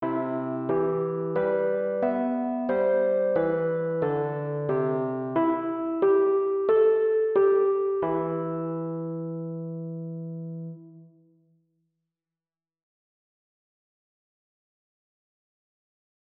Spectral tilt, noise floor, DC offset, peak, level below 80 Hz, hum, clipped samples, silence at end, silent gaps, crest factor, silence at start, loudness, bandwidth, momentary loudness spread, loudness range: -12 dB/octave; under -90 dBFS; under 0.1%; -12 dBFS; -68 dBFS; none; under 0.1%; 5.25 s; none; 16 dB; 0 s; -26 LUFS; 3.9 kHz; 13 LU; 15 LU